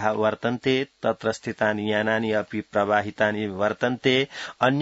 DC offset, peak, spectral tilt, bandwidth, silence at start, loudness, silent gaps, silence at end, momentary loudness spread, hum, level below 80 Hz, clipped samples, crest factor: under 0.1%; -6 dBFS; -5.5 dB/octave; 8 kHz; 0 s; -24 LUFS; none; 0 s; 5 LU; none; -64 dBFS; under 0.1%; 18 dB